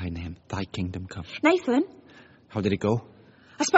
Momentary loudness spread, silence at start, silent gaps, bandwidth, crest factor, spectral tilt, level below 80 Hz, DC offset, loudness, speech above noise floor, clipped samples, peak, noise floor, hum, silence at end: 13 LU; 0 s; none; 8 kHz; 24 dB; -5 dB/octave; -52 dBFS; under 0.1%; -28 LUFS; 27 dB; under 0.1%; -2 dBFS; -53 dBFS; none; 0 s